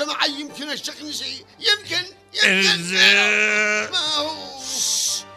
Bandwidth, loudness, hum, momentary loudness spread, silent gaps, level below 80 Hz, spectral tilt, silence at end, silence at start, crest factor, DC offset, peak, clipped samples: 15.5 kHz; -18 LUFS; none; 14 LU; none; -66 dBFS; -0.5 dB/octave; 0 s; 0 s; 20 dB; under 0.1%; -2 dBFS; under 0.1%